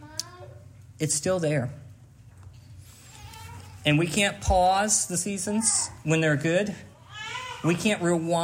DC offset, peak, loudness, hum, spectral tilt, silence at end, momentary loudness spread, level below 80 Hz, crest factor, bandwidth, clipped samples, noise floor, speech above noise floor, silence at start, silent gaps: under 0.1%; -8 dBFS; -25 LUFS; none; -4 dB/octave; 0 s; 21 LU; -46 dBFS; 18 dB; 16 kHz; under 0.1%; -50 dBFS; 25 dB; 0 s; none